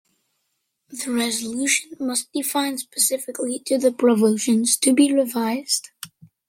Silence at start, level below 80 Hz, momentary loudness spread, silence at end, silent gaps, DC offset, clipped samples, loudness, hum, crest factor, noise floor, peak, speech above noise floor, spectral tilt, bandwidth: 0.9 s; -72 dBFS; 10 LU; 0.4 s; none; under 0.1%; under 0.1%; -21 LUFS; none; 18 dB; -74 dBFS; -4 dBFS; 53 dB; -2.5 dB/octave; 16.5 kHz